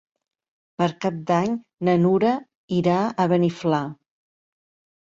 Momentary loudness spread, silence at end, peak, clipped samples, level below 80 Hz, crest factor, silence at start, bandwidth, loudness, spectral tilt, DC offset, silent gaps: 8 LU; 1.1 s; -8 dBFS; under 0.1%; -62 dBFS; 16 dB; 0.8 s; 7.6 kHz; -22 LUFS; -7.5 dB/octave; under 0.1%; 2.55-2.68 s